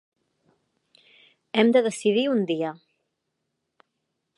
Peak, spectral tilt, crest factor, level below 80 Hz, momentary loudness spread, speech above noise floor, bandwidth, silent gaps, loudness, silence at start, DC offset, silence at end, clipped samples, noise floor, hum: -6 dBFS; -5 dB/octave; 22 dB; -82 dBFS; 9 LU; 58 dB; 11.5 kHz; none; -23 LUFS; 1.55 s; under 0.1%; 1.65 s; under 0.1%; -79 dBFS; none